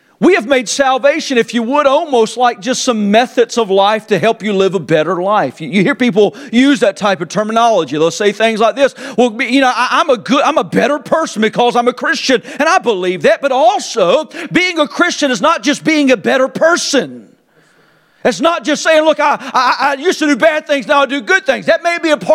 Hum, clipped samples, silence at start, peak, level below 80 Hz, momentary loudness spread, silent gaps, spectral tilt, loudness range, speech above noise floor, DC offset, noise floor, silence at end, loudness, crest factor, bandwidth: none; under 0.1%; 0.2 s; 0 dBFS; -58 dBFS; 4 LU; none; -4 dB/octave; 2 LU; 38 dB; under 0.1%; -50 dBFS; 0 s; -12 LUFS; 12 dB; 15 kHz